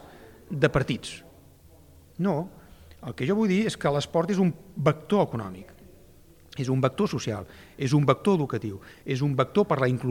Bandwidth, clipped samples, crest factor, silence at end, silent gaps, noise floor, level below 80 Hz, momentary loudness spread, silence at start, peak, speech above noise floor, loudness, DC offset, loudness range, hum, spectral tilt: 16.5 kHz; under 0.1%; 20 dB; 0 s; none; -53 dBFS; -54 dBFS; 17 LU; 0.05 s; -6 dBFS; 28 dB; -26 LUFS; under 0.1%; 3 LU; none; -7 dB/octave